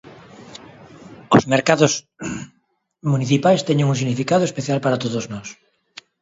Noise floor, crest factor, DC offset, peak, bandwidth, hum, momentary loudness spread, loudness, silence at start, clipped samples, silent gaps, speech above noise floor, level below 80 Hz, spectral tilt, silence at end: -66 dBFS; 20 dB; under 0.1%; 0 dBFS; 7.8 kHz; none; 22 LU; -19 LUFS; 0.05 s; under 0.1%; none; 48 dB; -56 dBFS; -5.5 dB/octave; 0.7 s